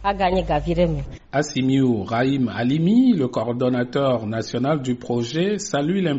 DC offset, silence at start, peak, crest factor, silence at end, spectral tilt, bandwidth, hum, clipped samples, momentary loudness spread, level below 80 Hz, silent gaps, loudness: under 0.1%; 0 s; -8 dBFS; 14 dB; 0 s; -6 dB/octave; 8 kHz; none; under 0.1%; 6 LU; -40 dBFS; none; -21 LUFS